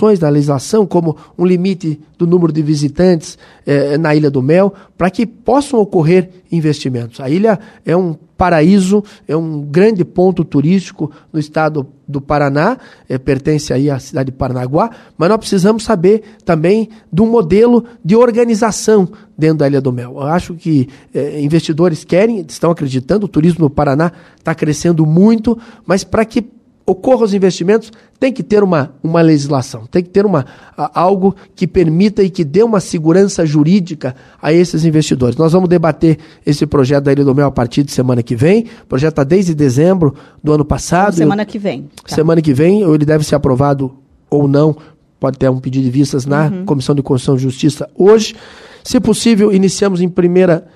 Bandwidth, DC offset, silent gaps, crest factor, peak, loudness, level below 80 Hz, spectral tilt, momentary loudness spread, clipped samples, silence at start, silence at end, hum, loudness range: 13 kHz; under 0.1%; none; 12 dB; 0 dBFS; -13 LUFS; -40 dBFS; -7 dB/octave; 9 LU; under 0.1%; 0 s; 0.15 s; none; 3 LU